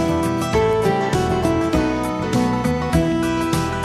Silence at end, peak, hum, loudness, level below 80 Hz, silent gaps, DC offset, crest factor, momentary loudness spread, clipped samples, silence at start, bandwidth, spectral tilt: 0 s; -4 dBFS; none; -19 LUFS; -34 dBFS; none; under 0.1%; 14 dB; 3 LU; under 0.1%; 0 s; 14 kHz; -6 dB/octave